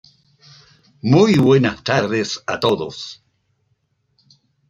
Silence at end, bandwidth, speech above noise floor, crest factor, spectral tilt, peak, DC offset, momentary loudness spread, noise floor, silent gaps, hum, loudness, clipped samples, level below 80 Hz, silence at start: 1.55 s; 10 kHz; 50 dB; 18 dB; -6 dB/octave; -2 dBFS; under 0.1%; 16 LU; -67 dBFS; none; none; -17 LUFS; under 0.1%; -56 dBFS; 1.05 s